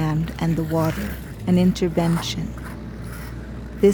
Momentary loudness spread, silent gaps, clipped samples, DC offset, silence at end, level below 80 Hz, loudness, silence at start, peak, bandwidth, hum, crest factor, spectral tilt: 15 LU; none; under 0.1%; under 0.1%; 0 s; -36 dBFS; -22 LUFS; 0 s; -6 dBFS; over 20 kHz; none; 16 dB; -7 dB/octave